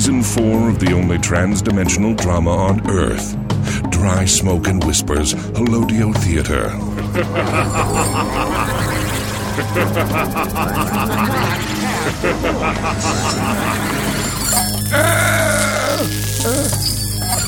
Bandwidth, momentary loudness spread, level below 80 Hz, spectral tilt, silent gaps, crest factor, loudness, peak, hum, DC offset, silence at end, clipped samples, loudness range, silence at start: 19.5 kHz; 5 LU; -30 dBFS; -4.5 dB/octave; none; 16 dB; -17 LUFS; 0 dBFS; none; under 0.1%; 0 s; under 0.1%; 2 LU; 0 s